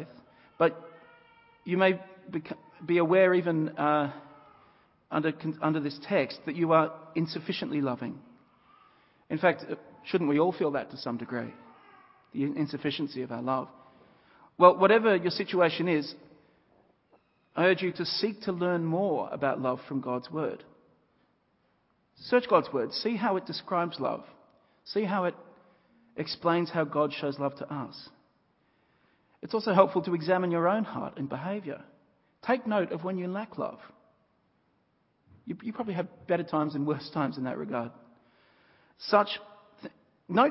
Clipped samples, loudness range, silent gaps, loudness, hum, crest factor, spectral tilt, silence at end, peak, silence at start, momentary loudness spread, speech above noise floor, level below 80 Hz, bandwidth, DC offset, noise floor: under 0.1%; 8 LU; none; -29 LUFS; none; 26 dB; -10 dB/octave; 0 s; -4 dBFS; 0 s; 16 LU; 43 dB; -74 dBFS; 5.8 kHz; under 0.1%; -71 dBFS